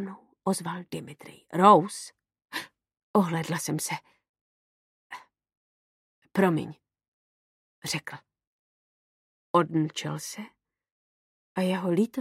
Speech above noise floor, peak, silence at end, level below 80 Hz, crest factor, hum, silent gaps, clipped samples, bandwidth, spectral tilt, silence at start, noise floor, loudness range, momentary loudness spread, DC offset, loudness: over 64 dB; -4 dBFS; 0 s; -76 dBFS; 26 dB; none; 3.03-3.14 s, 4.29-4.34 s, 4.41-5.10 s, 5.57-6.22 s, 7.08-7.82 s, 8.47-9.54 s, 10.92-11.55 s; under 0.1%; 16 kHz; -5.5 dB/octave; 0 s; under -90 dBFS; 8 LU; 24 LU; under 0.1%; -27 LUFS